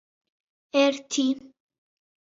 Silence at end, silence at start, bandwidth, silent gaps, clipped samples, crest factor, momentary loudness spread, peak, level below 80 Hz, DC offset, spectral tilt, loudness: 0.8 s; 0.75 s; 7.8 kHz; none; under 0.1%; 18 dB; 6 LU; -10 dBFS; -78 dBFS; under 0.1%; -1.5 dB/octave; -25 LUFS